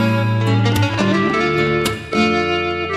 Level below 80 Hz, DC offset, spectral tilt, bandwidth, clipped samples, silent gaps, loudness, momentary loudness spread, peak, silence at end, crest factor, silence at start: -42 dBFS; under 0.1%; -6 dB/octave; 14 kHz; under 0.1%; none; -17 LUFS; 3 LU; -4 dBFS; 0 s; 12 dB; 0 s